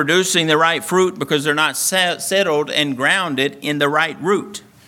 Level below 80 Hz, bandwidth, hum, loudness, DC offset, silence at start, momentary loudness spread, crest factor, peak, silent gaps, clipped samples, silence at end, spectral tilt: -66 dBFS; 18 kHz; none; -17 LUFS; under 0.1%; 0 s; 5 LU; 16 dB; 0 dBFS; none; under 0.1%; 0.3 s; -3 dB/octave